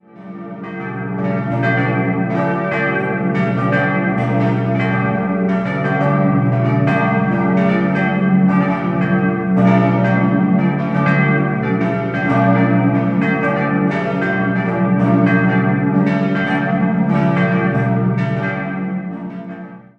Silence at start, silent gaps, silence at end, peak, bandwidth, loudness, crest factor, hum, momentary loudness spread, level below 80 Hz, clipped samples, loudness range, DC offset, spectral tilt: 0.15 s; none; 0.2 s; 0 dBFS; 5.6 kHz; -16 LUFS; 14 dB; none; 8 LU; -48 dBFS; under 0.1%; 2 LU; under 0.1%; -9.5 dB/octave